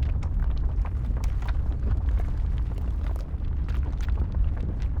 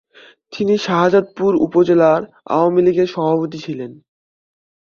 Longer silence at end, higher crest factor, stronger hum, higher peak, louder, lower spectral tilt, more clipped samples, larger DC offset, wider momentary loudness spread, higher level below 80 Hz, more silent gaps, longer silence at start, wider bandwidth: second, 0 s vs 1 s; about the same, 12 dB vs 16 dB; neither; second, -14 dBFS vs -2 dBFS; second, -29 LUFS vs -16 LUFS; about the same, -8 dB/octave vs -7 dB/octave; neither; neither; second, 3 LU vs 14 LU; first, -26 dBFS vs -58 dBFS; neither; second, 0 s vs 0.5 s; about the same, 6.6 kHz vs 7 kHz